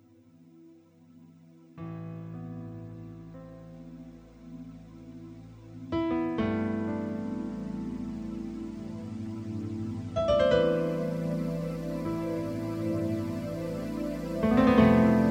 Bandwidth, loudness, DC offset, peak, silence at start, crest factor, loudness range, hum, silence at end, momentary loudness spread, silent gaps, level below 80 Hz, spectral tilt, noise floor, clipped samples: 14.5 kHz; -30 LUFS; under 0.1%; -8 dBFS; 0.55 s; 22 dB; 15 LU; none; 0 s; 23 LU; none; -50 dBFS; -8 dB/octave; -57 dBFS; under 0.1%